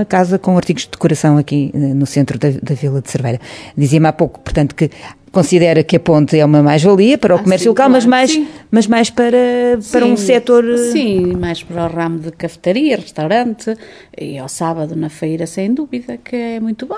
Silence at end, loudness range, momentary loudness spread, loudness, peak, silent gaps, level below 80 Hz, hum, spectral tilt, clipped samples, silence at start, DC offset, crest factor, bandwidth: 0 s; 8 LU; 11 LU; -13 LUFS; 0 dBFS; none; -42 dBFS; none; -6 dB/octave; under 0.1%; 0 s; under 0.1%; 12 dB; 11 kHz